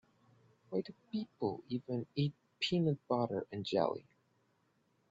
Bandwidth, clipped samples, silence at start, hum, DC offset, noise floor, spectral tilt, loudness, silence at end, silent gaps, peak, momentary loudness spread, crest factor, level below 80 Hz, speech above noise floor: 7.8 kHz; under 0.1%; 0.7 s; none; under 0.1%; -76 dBFS; -5.5 dB/octave; -38 LUFS; 1.1 s; none; -18 dBFS; 8 LU; 20 dB; -76 dBFS; 39 dB